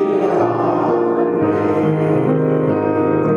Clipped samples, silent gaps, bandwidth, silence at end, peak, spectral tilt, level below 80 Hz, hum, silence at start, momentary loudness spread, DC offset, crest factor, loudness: under 0.1%; none; 6.8 kHz; 0 s; -4 dBFS; -9.5 dB/octave; -56 dBFS; none; 0 s; 1 LU; under 0.1%; 10 dB; -16 LUFS